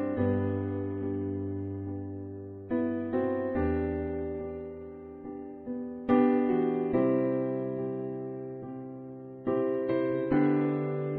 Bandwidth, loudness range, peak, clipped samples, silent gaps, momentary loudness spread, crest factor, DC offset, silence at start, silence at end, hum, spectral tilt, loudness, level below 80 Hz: 4.4 kHz; 4 LU; -12 dBFS; under 0.1%; none; 15 LU; 18 dB; under 0.1%; 0 s; 0 s; none; -12 dB/octave; -31 LUFS; -54 dBFS